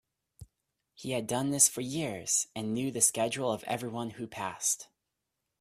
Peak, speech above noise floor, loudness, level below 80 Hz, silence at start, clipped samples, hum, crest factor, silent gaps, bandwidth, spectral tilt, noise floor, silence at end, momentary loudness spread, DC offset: -10 dBFS; 54 dB; -30 LUFS; -68 dBFS; 0.4 s; under 0.1%; none; 24 dB; none; 15.5 kHz; -3 dB/octave; -85 dBFS; 0.75 s; 13 LU; under 0.1%